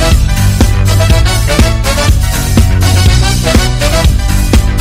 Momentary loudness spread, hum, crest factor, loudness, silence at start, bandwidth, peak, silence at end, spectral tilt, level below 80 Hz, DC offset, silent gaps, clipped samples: 2 LU; none; 8 dB; -10 LUFS; 0 s; 16.5 kHz; 0 dBFS; 0 s; -5 dB/octave; -10 dBFS; under 0.1%; none; 1%